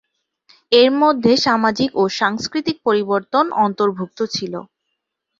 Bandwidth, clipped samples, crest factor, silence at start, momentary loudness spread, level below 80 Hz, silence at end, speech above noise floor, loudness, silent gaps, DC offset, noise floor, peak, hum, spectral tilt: 7.6 kHz; under 0.1%; 16 dB; 0.7 s; 9 LU; -58 dBFS; 0.75 s; 59 dB; -17 LUFS; none; under 0.1%; -76 dBFS; -2 dBFS; none; -4.5 dB/octave